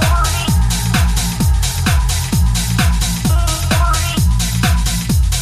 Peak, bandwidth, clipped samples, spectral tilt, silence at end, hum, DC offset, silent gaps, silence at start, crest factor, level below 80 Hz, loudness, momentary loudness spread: -2 dBFS; 15.5 kHz; under 0.1%; -4 dB/octave; 0 s; none; under 0.1%; none; 0 s; 12 dB; -18 dBFS; -15 LUFS; 1 LU